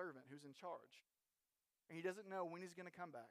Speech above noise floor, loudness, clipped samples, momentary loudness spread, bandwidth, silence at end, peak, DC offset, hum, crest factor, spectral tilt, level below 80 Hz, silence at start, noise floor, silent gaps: over 38 dB; -53 LUFS; under 0.1%; 11 LU; 15 kHz; 0 s; -34 dBFS; under 0.1%; none; 20 dB; -5.5 dB/octave; under -90 dBFS; 0 s; under -90 dBFS; none